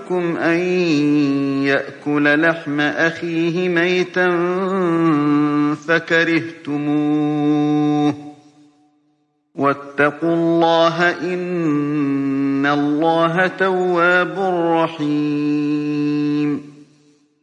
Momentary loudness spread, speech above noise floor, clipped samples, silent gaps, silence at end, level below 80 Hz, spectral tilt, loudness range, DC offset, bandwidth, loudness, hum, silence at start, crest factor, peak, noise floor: 5 LU; 47 dB; under 0.1%; none; 0.6 s; -70 dBFS; -6.5 dB/octave; 3 LU; under 0.1%; 9 kHz; -17 LUFS; none; 0 s; 14 dB; -2 dBFS; -64 dBFS